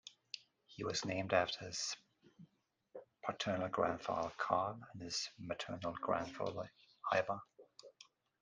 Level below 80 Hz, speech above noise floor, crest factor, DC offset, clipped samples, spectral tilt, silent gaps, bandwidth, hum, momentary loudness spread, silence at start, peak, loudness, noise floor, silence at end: -76 dBFS; 36 dB; 24 dB; under 0.1%; under 0.1%; -3.5 dB/octave; none; 10 kHz; none; 21 LU; 0.05 s; -18 dBFS; -40 LUFS; -76 dBFS; 0.4 s